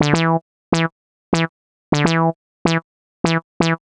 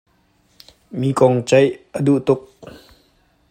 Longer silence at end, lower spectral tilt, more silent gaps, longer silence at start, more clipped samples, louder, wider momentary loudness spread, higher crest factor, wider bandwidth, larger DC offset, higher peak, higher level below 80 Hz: second, 0.1 s vs 1.1 s; about the same, -5.5 dB/octave vs -6.5 dB/octave; first, 0.42-0.72 s, 0.92-1.32 s, 1.49-1.92 s, 2.35-2.65 s, 2.84-3.24 s, 3.44-3.60 s vs none; second, 0 s vs 0.95 s; neither; second, -20 LUFS vs -17 LUFS; about the same, 7 LU vs 8 LU; about the same, 18 dB vs 18 dB; second, 9.8 kHz vs 15 kHz; neither; about the same, 0 dBFS vs 0 dBFS; first, -48 dBFS vs -58 dBFS